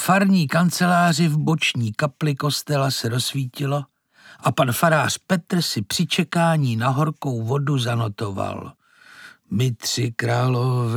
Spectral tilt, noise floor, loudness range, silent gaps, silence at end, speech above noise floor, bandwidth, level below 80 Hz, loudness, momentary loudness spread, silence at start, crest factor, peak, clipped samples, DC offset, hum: -5 dB/octave; -50 dBFS; 4 LU; none; 0 s; 29 dB; 18.5 kHz; -64 dBFS; -21 LUFS; 9 LU; 0 s; 18 dB; -4 dBFS; under 0.1%; under 0.1%; none